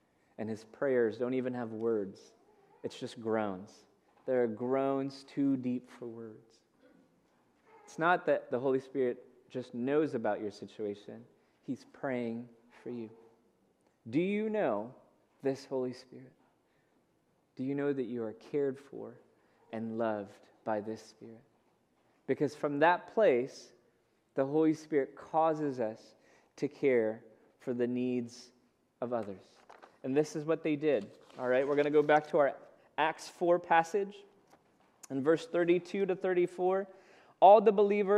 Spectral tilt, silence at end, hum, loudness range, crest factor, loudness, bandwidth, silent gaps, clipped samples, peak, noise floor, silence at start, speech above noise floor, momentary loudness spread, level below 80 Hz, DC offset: -6.5 dB/octave; 0 s; none; 8 LU; 24 dB; -32 LUFS; 11.5 kHz; none; under 0.1%; -10 dBFS; -73 dBFS; 0.4 s; 41 dB; 18 LU; -86 dBFS; under 0.1%